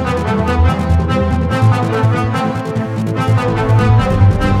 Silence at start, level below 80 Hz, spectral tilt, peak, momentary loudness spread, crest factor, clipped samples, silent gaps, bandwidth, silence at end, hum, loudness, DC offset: 0 s; -24 dBFS; -7.5 dB/octave; 0 dBFS; 7 LU; 12 dB; under 0.1%; none; 11 kHz; 0 s; none; -14 LUFS; under 0.1%